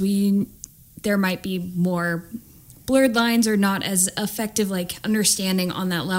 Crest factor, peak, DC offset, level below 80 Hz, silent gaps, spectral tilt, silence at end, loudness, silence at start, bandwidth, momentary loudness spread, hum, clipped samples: 16 dB; -6 dBFS; under 0.1%; -54 dBFS; none; -4 dB/octave; 0 s; -22 LUFS; 0 s; 16.5 kHz; 12 LU; none; under 0.1%